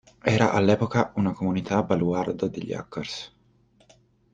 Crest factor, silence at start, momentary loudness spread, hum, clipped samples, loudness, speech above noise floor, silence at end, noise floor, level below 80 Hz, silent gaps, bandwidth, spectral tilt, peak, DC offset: 20 dB; 0.25 s; 12 LU; none; under 0.1%; -25 LUFS; 37 dB; 1.05 s; -61 dBFS; -58 dBFS; none; 8.8 kHz; -6.5 dB/octave; -6 dBFS; under 0.1%